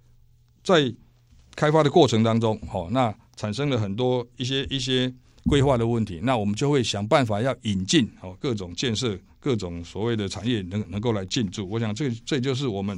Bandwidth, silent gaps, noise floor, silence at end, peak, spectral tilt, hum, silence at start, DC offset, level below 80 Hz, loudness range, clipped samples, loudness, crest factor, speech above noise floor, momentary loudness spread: 11 kHz; none; -56 dBFS; 0 s; -4 dBFS; -5.5 dB/octave; none; 0.65 s; under 0.1%; -46 dBFS; 4 LU; under 0.1%; -24 LUFS; 20 dB; 33 dB; 9 LU